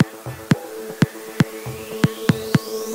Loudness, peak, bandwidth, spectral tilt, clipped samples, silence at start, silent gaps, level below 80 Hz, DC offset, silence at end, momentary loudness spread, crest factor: -22 LUFS; -2 dBFS; 16.5 kHz; -6 dB/octave; under 0.1%; 0 s; none; -52 dBFS; under 0.1%; 0 s; 11 LU; 20 dB